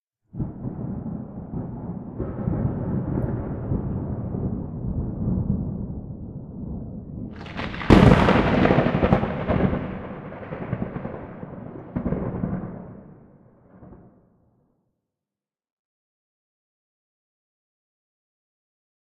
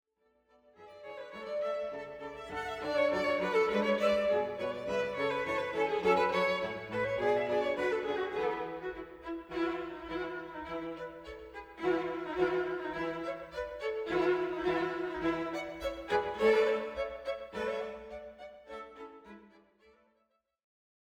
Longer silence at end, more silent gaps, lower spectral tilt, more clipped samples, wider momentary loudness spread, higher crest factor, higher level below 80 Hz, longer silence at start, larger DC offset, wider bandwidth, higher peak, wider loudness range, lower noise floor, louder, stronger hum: first, 5 s vs 1.65 s; neither; first, -8.5 dB/octave vs -5.5 dB/octave; neither; about the same, 18 LU vs 17 LU; about the same, 24 dB vs 20 dB; first, -38 dBFS vs -62 dBFS; second, 0.35 s vs 0.8 s; neither; second, 10.5 kHz vs 16 kHz; first, 0 dBFS vs -14 dBFS; first, 14 LU vs 8 LU; first, under -90 dBFS vs -77 dBFS; first, -24 LUFS vs -33 LUFS; neither